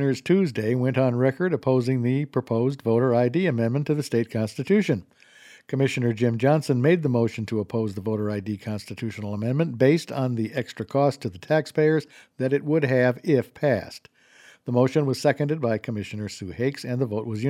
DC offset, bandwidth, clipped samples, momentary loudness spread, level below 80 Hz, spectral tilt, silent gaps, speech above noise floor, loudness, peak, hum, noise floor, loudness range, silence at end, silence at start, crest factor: under 0.1%; 14.5 kHz; under 0.1%; 10 LU; -64 dBFS; -7.5 dB/octave; none; 30 dB; -24 LUFS; -6 dBFS; none; -53 dBFS; 3 LU; 0 s; 0 s; 18 dB